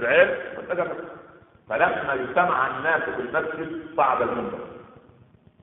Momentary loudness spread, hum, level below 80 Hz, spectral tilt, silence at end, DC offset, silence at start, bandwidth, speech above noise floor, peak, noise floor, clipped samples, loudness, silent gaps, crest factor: 12 LU; none; -60 dBFS; -2.5 dB/octave; 0.75 s; under 0.1%; 0 s; 4 kHz; 30 dB; -4 dBFS; -55 dBFS; under 0.1%; -24 LUFS; none; 22 dB